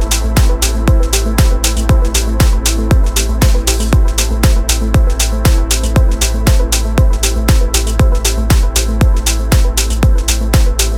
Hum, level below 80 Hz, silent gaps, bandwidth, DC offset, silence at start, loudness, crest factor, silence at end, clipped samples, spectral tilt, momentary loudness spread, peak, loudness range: none; -12 dBFS; none; 17 kHz; under 0.1%; 0 s; -13 LUFS; 10 dB; 0 s; under 0.1%; -4 dB/octave; 2 LU; 0 dBFS; 0 LU